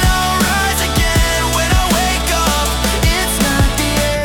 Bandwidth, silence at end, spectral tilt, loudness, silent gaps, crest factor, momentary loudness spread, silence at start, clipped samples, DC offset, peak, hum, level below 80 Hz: 19 kHz; 0 s; -3.5 dB/octave; -14 LUFS; none; 10 dB; 1 LU; 0 s; under 0.1%; under 0.1%; -4 dBFS; none; -20 dBFS